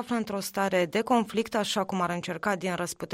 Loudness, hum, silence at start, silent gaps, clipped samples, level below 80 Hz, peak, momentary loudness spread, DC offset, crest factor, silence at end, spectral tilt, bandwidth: -28 LUFS; none; 0 s; none; under 0.1%; -64 dBFS; -12 dBFS; 5 LU; under 0.1%; 18 dB; 0 s; -4.5 dB/octave; 16 kHz